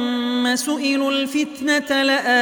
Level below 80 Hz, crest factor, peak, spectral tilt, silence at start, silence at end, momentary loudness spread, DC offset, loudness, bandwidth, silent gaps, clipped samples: -66 dBFS; 14 dB; -6 dBFS; -1.5 dB/octave; 0 s; 0 s; 4 LU; under 0.1%; -19 LUFS; 19 kHz; none; under 0.1%